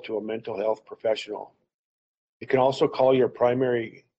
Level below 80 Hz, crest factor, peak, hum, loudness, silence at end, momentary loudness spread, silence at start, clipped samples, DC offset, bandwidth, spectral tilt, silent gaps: -68 dBFS; 18 dB; -8 dBFS; none; -25 LUFS; 0.3 s; 10 LU; 0.05 s; under 0.1%; under 0.1%; 8.4 kHz; -6.5 dB/octave; 1.74-2.40 s